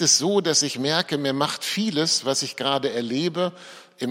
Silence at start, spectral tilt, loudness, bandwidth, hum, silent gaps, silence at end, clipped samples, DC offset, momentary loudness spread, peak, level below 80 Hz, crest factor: 0 s; -2.5 dB/octave; -22 LUFS; 16.5 kHz; none; none; 0 s; under 0.1%; under 0.1%; 7 LU; -4 dBFS; -72 dBFS; 18 dB